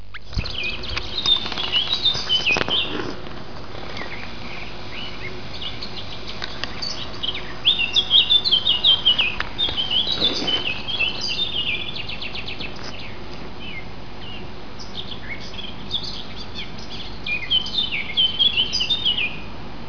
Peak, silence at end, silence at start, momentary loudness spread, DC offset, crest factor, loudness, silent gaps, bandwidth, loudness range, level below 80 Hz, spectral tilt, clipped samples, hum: -2 dBFS; 0 s; 0 s; 19 LU; 4%; 22 dB; -20 LUFS; none; 5.4 kHz; 15 LU; -42 dBFS; -2.5 dB/octave; under 0.1%; none